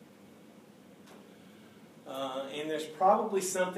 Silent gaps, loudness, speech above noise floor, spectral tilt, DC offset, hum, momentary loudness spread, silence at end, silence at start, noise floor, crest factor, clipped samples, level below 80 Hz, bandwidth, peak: none; -31 LUFS; 25 dB; -3.5 dB/octave; under 0.1%; none; 27 LU; 0 s; 0 s; -56 dBFS; 22 dB; under 0.1%; -90 dBFS; 15.5 kHz; -12 dBFS